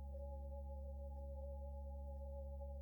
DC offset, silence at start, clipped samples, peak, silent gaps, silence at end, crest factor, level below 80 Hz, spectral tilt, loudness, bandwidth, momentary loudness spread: under 0.1%; 0 s; under 0.1%; -42 dBFS; none; 0 s; 8 dB; -50 dBFS; -11 dB/octave; -51 LUFS; 17.5 kHz; 0 LU